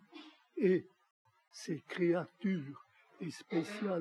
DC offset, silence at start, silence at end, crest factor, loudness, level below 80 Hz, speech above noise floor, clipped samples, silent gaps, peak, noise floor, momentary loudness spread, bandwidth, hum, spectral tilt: under 0.1%; 0.15 s; 0 s; 18 dB; -37 LUFS; under -90 dBFS; 21 dB; under 0.1%; 1.11-1.25 s; -20 dBFS; -57 dBFS; 22 LU; 12 kHz; none; -7 dB/octave